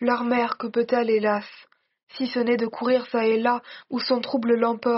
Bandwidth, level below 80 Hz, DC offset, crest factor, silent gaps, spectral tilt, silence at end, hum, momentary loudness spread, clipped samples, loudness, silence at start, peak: 6 kHz; -72 dBFS; under 0.1%; 16 dB; 2.03-2.07 s; -3 dB/octave; 0 s; none; 7 LU; under 0.1%; -24 LUFS; 0 s; -8 dBFS